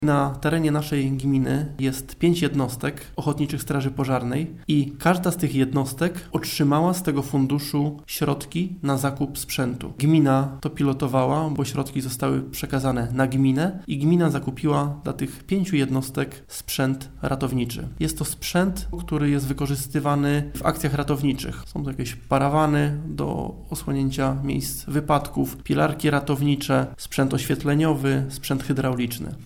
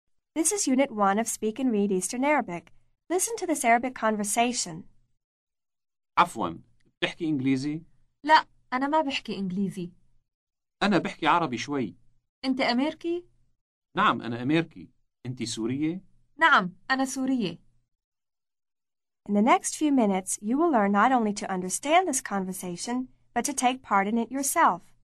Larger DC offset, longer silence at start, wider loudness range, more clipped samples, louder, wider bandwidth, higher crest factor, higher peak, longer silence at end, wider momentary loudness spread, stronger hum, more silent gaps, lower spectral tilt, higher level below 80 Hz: neither; second, 0 s vs 0.35 s; about the same, 2 LU vs 4 LU; neither; about the same, -24 LUFS vs -26 LUFS; first, 18.5 kHz vs 13.5 kHz; about the same, 18 dB vs 20 dB; first, -4 dBFS vs -8 dBFS; second, 0 s vs 0.25 s; second, 7 LU vs 12 LU; neither; second, none vs 5.24-5.47 s, 6.97-7.01 s, 10.34-10.47 s, 12.29-12.42 s, 13.61-13.82 s, 18.04-18.12 s; first, -6 dB/octave vs -3.5 dB/octave; first, -42 dBFS vs -64 dBFS